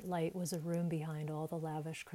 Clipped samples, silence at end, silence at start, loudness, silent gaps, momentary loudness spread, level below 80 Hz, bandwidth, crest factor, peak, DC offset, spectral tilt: under 0.1%; 0 s; 0 s; -40 LUFS; none; 4 LU; -76 dBFS; 16 kHz; 14 dB; -26 dBFS; under 0.1%; -6.5 dB/octave